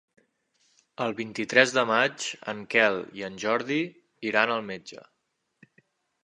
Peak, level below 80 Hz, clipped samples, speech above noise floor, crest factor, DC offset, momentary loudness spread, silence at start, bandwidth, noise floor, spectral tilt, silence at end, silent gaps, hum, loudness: -2 dBFS; -74 dBFS; under 0.1%; 51 dB; 26 dB; under 0.1%; 15 LU; 1 s; 11 kHz; -78 dBFS; -3.5 dB/octave; 1.3 s; none; none; -26 LUFS